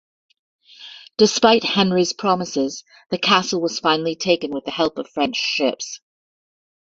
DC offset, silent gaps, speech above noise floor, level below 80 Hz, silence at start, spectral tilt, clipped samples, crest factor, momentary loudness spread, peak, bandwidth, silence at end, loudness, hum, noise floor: under 0.1%; none; 22 dB; -62 dBFS; 0.8 s; -3.5 dB/octave; under 0.1%; 20 dB; 15 LU; -2 dBFS; 7.8 kHz; 0.95 s; -19 LUFS; none; -42 dBFS